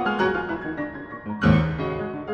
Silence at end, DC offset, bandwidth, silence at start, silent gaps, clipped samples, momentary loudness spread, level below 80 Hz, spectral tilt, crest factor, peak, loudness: 0 s; under 0.1%; 6.6 kHz; 0 s; none; under 0.1%; 13 LU; -40 dBFS; -8.5 dB/octave; 20 dB; -4 dBFS; -24 LUFS